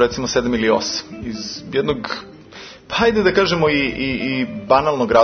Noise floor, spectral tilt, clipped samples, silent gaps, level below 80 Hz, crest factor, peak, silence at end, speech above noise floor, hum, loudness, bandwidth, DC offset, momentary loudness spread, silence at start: -39 dBFS; -4.5 dB/octave; under 0.1%; none; -44 dBFS; 18 dB; 0 dBFS; 0 s; 21 dB; none; -18 LUFS; 6.6 kHz; under 0.1%; 14 LU; 0 s